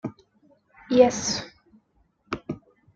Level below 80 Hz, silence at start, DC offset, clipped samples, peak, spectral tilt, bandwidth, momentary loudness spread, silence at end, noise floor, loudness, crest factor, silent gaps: -60 dBFS; 0.05 s; under 0.1%; under 0.1%; -4 dBFS; -4 dB/octave; 7.8 kHz; 20 LU; 0.4 s; -66 dBFS; -24 LUFS; 22 dB; none